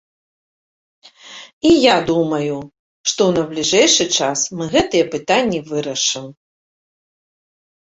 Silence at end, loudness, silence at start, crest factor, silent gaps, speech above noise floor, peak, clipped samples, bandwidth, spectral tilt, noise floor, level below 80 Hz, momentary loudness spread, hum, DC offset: 1.6 s; -16 LUFS; 1.25 s; 18 dB; 1.53-1.61 s, 2.79-3.04 s; 23 dB; -2 dBFS; under 0.1%; 8 kHz; -3 dB/octave; -39 dBFS; -50 dBFS; 12 LU; none; under 0.1%